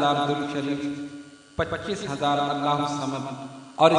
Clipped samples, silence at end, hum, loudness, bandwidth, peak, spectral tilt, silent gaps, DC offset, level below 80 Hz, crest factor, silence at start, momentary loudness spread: under 0.1%; 0 s; none; -27 LUFS; 10.5 kHz; -2 dBFS; -5.5 dB/octave; none; under 0.1%; -56 dBFS; 24 dB; 0 s; 14 LU